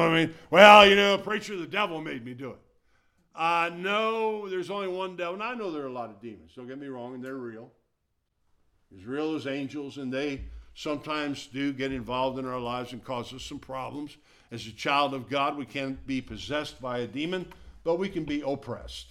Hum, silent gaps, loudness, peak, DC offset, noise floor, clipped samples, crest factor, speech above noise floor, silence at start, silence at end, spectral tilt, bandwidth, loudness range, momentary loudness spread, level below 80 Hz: none; none; -26 LUFS; 0 dBFS; under 0.1%; -77 dBFS; under 0.1%; 28 dB; 50 dB; 0 s; 0.05 s; -4.5 dB/octave; 15.5 kHz; 12 LU; 16 LU; -56 dBFS